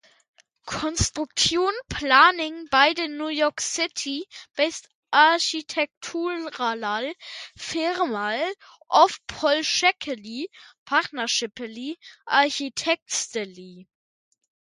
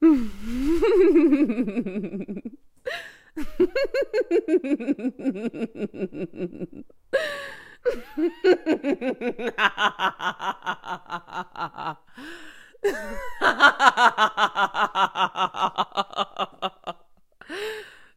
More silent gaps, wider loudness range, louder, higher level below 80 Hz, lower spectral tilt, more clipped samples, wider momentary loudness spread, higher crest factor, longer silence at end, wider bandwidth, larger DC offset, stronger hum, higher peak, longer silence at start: first, 4.95-5.03 s, 5.97-6.01 s, 10.78-10.86 s, 13.02-13.06 s vs none; second, 5 LU vs 9 LU; about the same, -23 LUFS vs -24 LUFS; about the same, -50 dBFS vs -46 dBFS; second, -2 dB/octave vs -4.5 dB/octave; neither; second, 16 LU vs 19 LU; about the same, 22 dB vs 24 dB; first, 0.95 s vs 0.25 s; second, 11.5 kHz vs 15 kHz; neither; neither; about the same, -2 dBFS vs 0 dBFS; first, 0.65 s vs 0 s